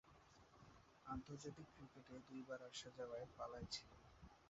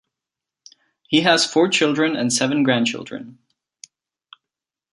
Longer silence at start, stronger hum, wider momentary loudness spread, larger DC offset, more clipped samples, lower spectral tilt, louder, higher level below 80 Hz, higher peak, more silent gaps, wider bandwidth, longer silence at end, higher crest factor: second, 0.05 s vs 1.1 s; neither; first, 16 LU vs 13 LU; neither; neither; about the same, -4 dB/octave vs -3.5 dB/octave; second, -55 LUFS vs -18 LUFS; about the same, -72 dBFS vs -68 dBFS; second, -36 dBFS vs -2 dBFS; neither; second, 7.6 kHz vs 11.5 kHz; second, 0 s vs 1.6 s; about the same, 20 dB vs 20 dB